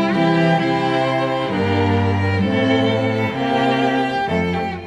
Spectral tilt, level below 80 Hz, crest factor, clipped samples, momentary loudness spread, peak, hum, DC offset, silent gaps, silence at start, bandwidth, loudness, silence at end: -7 dB/octave; -50 dBFS; 12 dB; under 0.1%; 4 LU; -4 dBFS; none; under 0.1%; none; 0 s; 11 kHz; -18 LUFS; 0 s